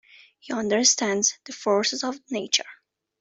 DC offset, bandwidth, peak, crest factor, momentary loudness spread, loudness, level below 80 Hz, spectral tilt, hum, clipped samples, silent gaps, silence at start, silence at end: under 0.1%; 8.2 kHz; -6 dBFS; 20 dB; 12 LU; -23 LUFS; -70 dBFS; -1.5 dB/octave; none; under 0.1%; none; 0.45 s; 0.45 s